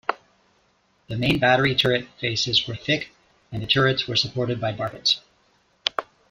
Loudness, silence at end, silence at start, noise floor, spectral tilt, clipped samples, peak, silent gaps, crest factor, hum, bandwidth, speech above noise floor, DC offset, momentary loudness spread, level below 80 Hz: -22 LUFS; 0.25 s; 0.1 s; -64 dBFS; -4.5 dB/octave; under 0.1%; -2 dBFS; none; 24 dB; none; 14.5 kHz; 42 dB; under 0.1%; 15 LU; -52 dBFS